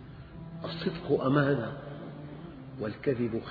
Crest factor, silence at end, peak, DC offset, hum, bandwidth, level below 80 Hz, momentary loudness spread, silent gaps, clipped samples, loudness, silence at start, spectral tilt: 20 dB; 0 s; -12 dBFS; under 0.1%; none; 5.2 kHz; -56 dBFS; 18 LU; none; under 0.1%; -31 LUFS; 0 s; -10 dB/octave